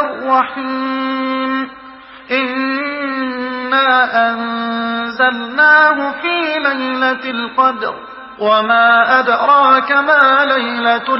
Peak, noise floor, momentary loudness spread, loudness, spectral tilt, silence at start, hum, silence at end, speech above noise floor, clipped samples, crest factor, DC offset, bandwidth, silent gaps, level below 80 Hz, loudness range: 0 dBFS; -36 dBFS; 10 LU; -13 LUFS; -6.5 dB/octave; 0 s; none; 0 s; 23 dB; under 0.1%; 14 dB; under 0.1%; 5.8 kHz; none; -58 dBFS; 6 LU